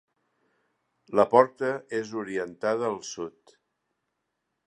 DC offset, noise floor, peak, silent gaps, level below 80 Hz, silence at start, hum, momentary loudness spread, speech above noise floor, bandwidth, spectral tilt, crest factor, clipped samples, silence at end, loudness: under 0.1%; -80 dBFS; -4 dBFS; none; -74 dBFS; 1.1 s; none; 15 LU; 54 dB; 9.4 kHz; -5 dB/octave; 26 dB; under 0.1%; 1.4 s; -26 LUFS